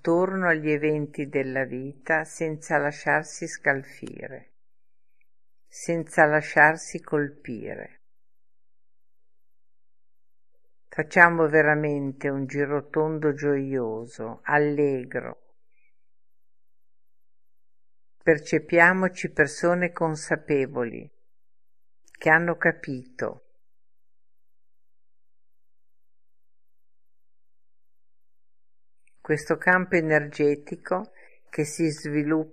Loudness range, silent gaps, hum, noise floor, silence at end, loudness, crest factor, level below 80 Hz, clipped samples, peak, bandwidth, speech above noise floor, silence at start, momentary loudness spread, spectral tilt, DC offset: 10 LU; none; none; -87 dBFS; 0.05 s; -24 LUFS; 26 dB; -66 dBFS; under 0.1%; 0 dBFS; 13.5 kHz; 63 dB; 0.05 s; 16 LU; -6 dB/octave; 0.3%